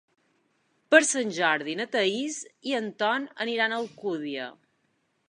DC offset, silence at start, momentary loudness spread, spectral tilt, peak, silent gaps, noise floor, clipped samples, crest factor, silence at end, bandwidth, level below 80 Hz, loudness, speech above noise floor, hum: under 0.1%; 0.9 s; 14 LU; -2 dB/octave; -2 dBFS; none; -73 dBFS; under 0.1%; 26 dB; 0.75 s; 11.5 kHz; -84 dBFS; -26 LUFS; 46 dB; none